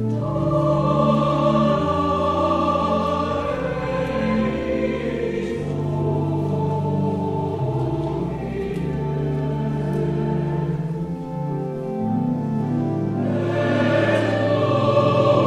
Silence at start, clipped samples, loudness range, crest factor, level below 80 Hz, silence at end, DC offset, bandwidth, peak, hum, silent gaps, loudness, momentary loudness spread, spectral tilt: 0 s; under 0.1%; 5 LU; 16 dB; -42 dBFS; 0 s; under 0.1%; 10 kHz; -4 dBFS; none; none; -22 LUFS; 7 LU; -8 dB/octave